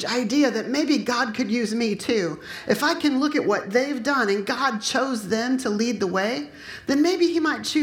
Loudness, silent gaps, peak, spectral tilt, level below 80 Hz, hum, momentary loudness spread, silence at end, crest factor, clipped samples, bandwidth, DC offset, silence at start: -23 LUFS; none; -6 dBFS; -4 dB/octave; -62 dBFS; none; 4 LU; 0 s; 16 dB; under 0.1%; 17 kHz; under 0.1%; 0 s